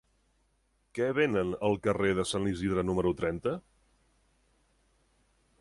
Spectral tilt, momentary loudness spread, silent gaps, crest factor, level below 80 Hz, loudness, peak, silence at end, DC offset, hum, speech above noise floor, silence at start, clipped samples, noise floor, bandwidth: -6 dB/octave; 7 LU; none; 18 dB; -54 dBFS; -30 LUFS; -14 dBFS; 2 s; under 0.1%; none; 43 dB; 0.95 s; under 0.1%; -72 dBFS; 11.5 kHz